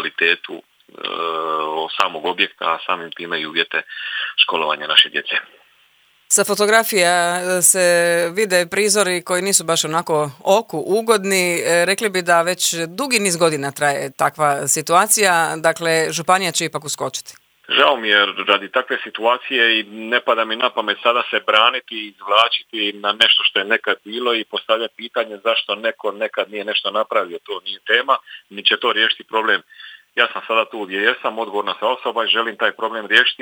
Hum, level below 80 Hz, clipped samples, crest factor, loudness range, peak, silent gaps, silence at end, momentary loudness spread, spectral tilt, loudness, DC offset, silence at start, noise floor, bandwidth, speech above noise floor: none; -72 dBFS; under 0.1%; 18 dB; 5 LU; 0 dBFS; none; 0.1 s; 10 LU; -1.5 dB/octave; -17 LUFS; under 0.1%; 0 s; -56 dBFS; over 20 kHz; 38 dB